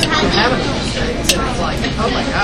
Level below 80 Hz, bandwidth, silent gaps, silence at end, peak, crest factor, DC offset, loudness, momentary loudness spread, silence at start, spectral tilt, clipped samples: -26 dBFS; 16 kHz; none; 0 s; 0 dBFS; 16 dB; under 0.1%; -16 LUFS; 5 LU; 0 s; -4 dB/octave; under 0.1%